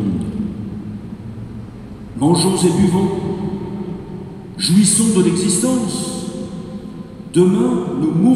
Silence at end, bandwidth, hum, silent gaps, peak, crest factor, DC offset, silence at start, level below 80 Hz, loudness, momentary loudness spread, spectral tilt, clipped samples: 0 s; 15 kHz; none; none; -2 dBFS; 16 dB; under 0.1%; 0 s; -44 dBFS; -17 LUFS; 18 LU; -5 dB/octave; under 0.1%